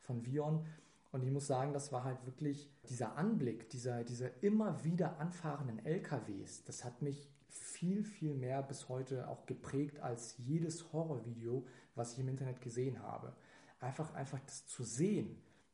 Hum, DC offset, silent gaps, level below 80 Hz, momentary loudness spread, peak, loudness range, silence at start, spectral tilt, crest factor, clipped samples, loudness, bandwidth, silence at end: none; under 0.1%; none; -78 dBFS; 11 LU; -24 dBFS; 4 LU; 0.05 s; -6.5 dB/octave; 18 dB; under 0.1%; -42 LUFS; 10.5 kHz; 0.3 s